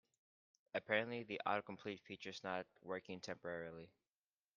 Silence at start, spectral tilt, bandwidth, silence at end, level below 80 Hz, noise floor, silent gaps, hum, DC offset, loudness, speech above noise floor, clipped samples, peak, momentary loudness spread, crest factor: 0.75 s; -2.5 dB/octave; 7.2 kHz; 0.65 s; -86 dBFS; under -90 dBFS; none; none; under 0.1%; -45 LUFS; over 44 dB; under 0.1%; -20 dBFS; 11 LU; 26 dB